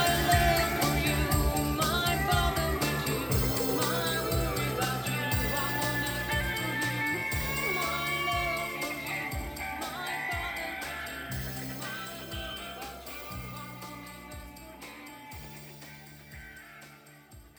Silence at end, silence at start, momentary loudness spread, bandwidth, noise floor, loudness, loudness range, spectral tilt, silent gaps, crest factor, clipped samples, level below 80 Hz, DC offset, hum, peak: 0.1 s; 0 s; 18 LU; over 20 kHz; -53 dBFS; -30 LUFS; 15 LU; -4 dB/octave; none; 20 dB; under 0.1%; -40 dBFS; under 0.1%; none; -12 dBFS